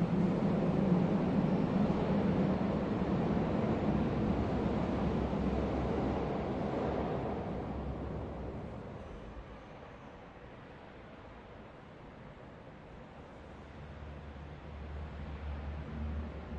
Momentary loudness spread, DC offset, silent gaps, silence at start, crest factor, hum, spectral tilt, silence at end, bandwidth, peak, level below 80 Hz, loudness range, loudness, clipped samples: 20 LU; under 0.1%; none; 0 s; 18 dB; none; -9 dB/octave; 0 s; 7.8 kHz; -18 dBFS; -48 dBFS; 19 LU; -34 LUFS; under 0.1%